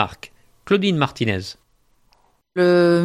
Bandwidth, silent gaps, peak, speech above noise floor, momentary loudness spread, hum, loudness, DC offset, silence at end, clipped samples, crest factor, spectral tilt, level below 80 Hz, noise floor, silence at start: 11 kHz; none; -2 dBFS; 42 dB; 21 LU; none; -19 LUFS; under 0.1%; 0 s; under 0.1%; 20 dB; -6.5 dB/octave; -56 dBFS; -60 dBFS; 0 s